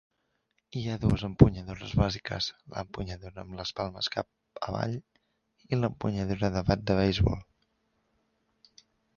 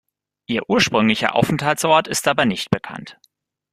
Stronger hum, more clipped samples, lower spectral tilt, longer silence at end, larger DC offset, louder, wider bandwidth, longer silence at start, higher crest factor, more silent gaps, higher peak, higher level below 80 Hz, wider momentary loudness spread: neither; neither; first, -7 dB/octave vs -4 dB/octave; first, 1.75 s vs 0.6 s; neither; second, -30 LUFS vs -18 LUFS; second, 7.2 kHz vs 15.5 kHz; first, 0.75 s vs 0.5 s; first, 28 dB vs 18 dB; neither; about the same, -4 dBFS vs -2 dBFS; first, -44 dBFS vs -54 dBFS; first, 16 LU vs 9 LU